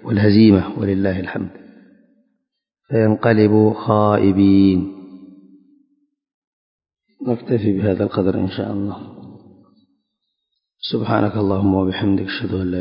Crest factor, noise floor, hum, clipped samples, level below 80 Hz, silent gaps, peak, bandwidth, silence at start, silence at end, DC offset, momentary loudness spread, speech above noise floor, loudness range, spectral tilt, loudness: 18 dB; -76 dBFS; none; under 0.1%; -42 dBFS; 6.34-6.79 s; 0 dBFS; 5.4 kHz; 0.05 s; 0 s; under 0.1%; 15 LU; 60 dB; 8 LU; -12.5 dB/octave; -17 LUFS